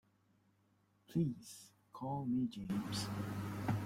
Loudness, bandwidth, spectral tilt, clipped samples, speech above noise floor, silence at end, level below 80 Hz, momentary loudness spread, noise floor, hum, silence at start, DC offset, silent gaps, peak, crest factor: -41 LUFS; 16.5 kHz; -6 dB/octave; under 0.1%; 35 dB; 0 s; -68 dBFS; 14 LU; -75 dBFS; none; 1.1 s; under 0.1%; none; -24 dBFS; 16 dB